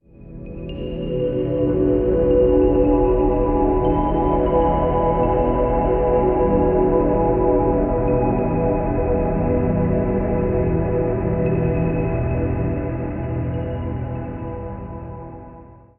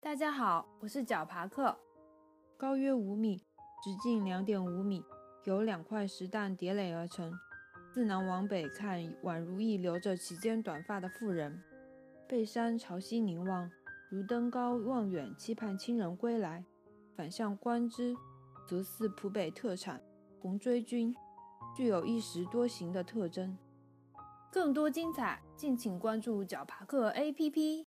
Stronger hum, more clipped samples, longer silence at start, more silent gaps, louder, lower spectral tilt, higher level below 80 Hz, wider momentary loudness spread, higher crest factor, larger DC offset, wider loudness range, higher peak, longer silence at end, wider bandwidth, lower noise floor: neither; neither; first, 0.2 s vs 0.05 s; neither; first, -19 LUFS vs -37 LUFS; first, -9.5 dB/octave vs -6 dB/octave; first, -28 dBFS vs -80 dBFS; about the same, 13 LU vs 13 LU; about the same, 14 dB vs 18 dB; neither; first, 6 LU vs 2 LU; first, -6 dBFS vs -18 dBFS; first, 0.25 s vs 0 s; second, 3.3 kHz vs 15.5 kHz; second, -42 dBFS vs -65 dBFS